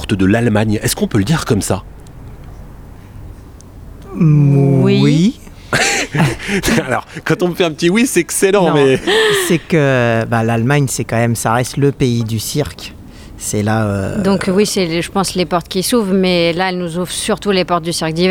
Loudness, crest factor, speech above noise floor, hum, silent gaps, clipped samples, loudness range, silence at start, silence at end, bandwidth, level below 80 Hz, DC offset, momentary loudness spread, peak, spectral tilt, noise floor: -14 LUFS; 14 dB; 21 dB; none; none; under 0.1%; 4 LU; 0 s; 0 s; 18 kHz; -38 dBFS; under 0.1%; 8 LU; 0 dBFS; -5 dB/octave; -35 dBFS